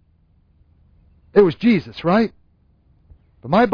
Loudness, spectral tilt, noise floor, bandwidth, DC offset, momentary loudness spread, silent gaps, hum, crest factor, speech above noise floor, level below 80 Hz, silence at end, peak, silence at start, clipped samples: -18 LUFS; -8.5 dB/octave; -57 dBFS; 5.4 kHz; under 0.1%; 7 LU; none; none; 18 dB; 42 dB; -50 dBFS; 0 s; -2 dBFS; 1.35 s; under 0.1%